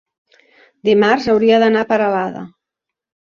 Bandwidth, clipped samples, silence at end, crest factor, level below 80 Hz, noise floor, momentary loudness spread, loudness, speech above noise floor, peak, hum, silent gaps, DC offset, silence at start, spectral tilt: 7 kHz; under 0.1%; 0.8 s; 14 dB; -56 dBFS; -83 dBFS; 11 LU; -15 LUFS; 69 dB; -2 dBFS; none; none; under 0.1%; 0.85 s; -6 dB/octave